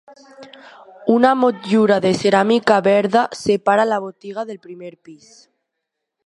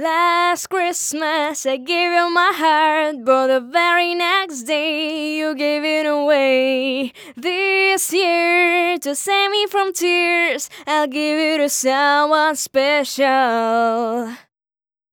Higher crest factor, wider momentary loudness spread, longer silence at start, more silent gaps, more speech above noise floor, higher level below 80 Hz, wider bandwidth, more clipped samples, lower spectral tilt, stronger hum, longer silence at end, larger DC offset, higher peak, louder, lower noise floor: about the same, 18 dB vs 16 dB; first, 16 LU vs 7 LU; first, 0.4 s vs 0 s; neither; second, 61 dB vs over 72 dB; first, -62 dBFS vs -76 dBFS; second, 11.5 kHz vs over 20 kHz; neither; first, -5.5 dB/octave vs -1 dB/octave; neither; first, 1.1 s vs 0.75 s; neither; about the same, 0 dBFS vs -2 dBFS; about the same, -16 LUFS vs -17 LUFS; second, -79 dBFS vs under -90 dBFS